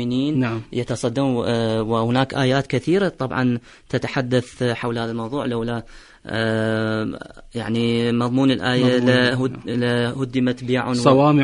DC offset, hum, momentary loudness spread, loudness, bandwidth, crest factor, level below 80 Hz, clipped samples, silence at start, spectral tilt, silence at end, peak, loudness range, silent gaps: under 0.1%; none; 9 LU; -21 LUFS; 11 kHz; 18 dB; -48 dBFS; under 0.1%; 0 s; -6.5 dB/octave; 0 s; -2 dBFS; 5 LU; none